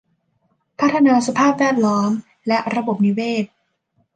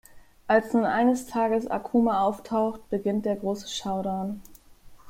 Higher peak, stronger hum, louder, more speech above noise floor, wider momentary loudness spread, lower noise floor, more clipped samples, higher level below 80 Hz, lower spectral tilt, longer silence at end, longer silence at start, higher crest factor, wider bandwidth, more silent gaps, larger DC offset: about the same, -4 dBFS vs -6 dBFS; neither; first, -18 LUFS vs -26 LUFS; first, 49 dB vs 24 dB; about the same, 8 LU vs 9 LU; first, -66 dBFS vs -49 dBFS; neither; second, -66 dBFS vs -56 dBFS; about the same, -5.5 dB/octave vs -5.5 dB/octave; first, 0.7 s vs 0 s; first, 0.8 s vs 0.15 s; second, 14 dB vs 20 dB; second, 9.4 kHz vs 16.5 kHz; neither; neither